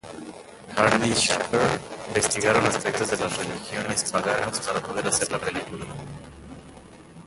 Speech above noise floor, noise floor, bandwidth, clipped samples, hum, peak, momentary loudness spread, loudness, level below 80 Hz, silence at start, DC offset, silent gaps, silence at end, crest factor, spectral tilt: 21 dB; -46 dBFS; 12 kHz; under 0.1%; none; -2 dBFS; 20 LU; -24 LUFS; -52 dBFS; 0.05 s; under 0.1%; none; 0 s; 24 dB; -3 dB/octave